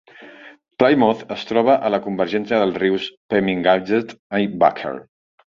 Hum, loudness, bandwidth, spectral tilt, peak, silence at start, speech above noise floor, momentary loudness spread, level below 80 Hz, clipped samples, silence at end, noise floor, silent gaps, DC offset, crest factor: none; -19 LUFS; 7.2 kHz; -7 dB/octave; -2 dBFS; 0.2 s; 24 dB; 9 LU; -58 dBFS; under 0.1%; 0.55 s; -43 dBFS; 3.17-3.29 s, 4.19-4.30 s; under 0.1%; 18 dB